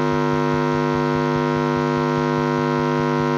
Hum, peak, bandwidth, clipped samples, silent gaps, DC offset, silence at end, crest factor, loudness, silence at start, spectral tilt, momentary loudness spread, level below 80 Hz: none; -6 dBFS; 7.4 kHz; under 0.1%; none; under 0.1%; 0 s; 14 dB; -20 LUFS; 0 s; -7 dB/octave; 0 LU; -48 dBFS